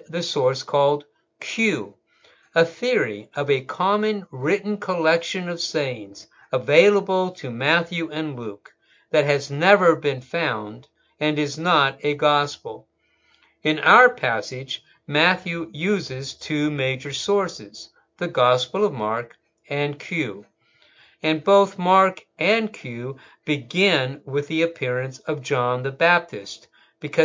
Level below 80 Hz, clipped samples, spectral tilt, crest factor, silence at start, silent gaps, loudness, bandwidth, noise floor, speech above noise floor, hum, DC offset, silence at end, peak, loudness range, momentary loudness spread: -68 dBFS; under 0.1%; -5 dB/octave; 22 dB; 0.1 s; none; -22 LUFS; 7.6 kHz; -63 dBFS; 41 dB; none; under 0.1%; 0 s; 0 dBFS; 4 LU; 14 LU